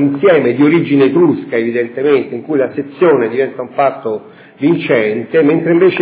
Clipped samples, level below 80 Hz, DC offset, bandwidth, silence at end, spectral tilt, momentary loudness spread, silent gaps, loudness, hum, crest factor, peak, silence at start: under 0.1%; -64 dBFS; under 0.1%; 4 kHz; 0 s; -11 dB/octave; 7 LU; none; -13 LUFS; none; 12 dB; 0 dBFS; 0 s